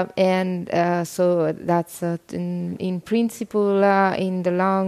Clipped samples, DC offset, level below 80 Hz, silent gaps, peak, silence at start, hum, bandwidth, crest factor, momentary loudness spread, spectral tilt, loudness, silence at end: under 0.1%; under 0.1%; -64 dBFS; none; -6 dBFS; 0 s; none; 15 kHz; 16 dB; 10 LU; -6.5 dB/octave; -22 LUFS; 0 s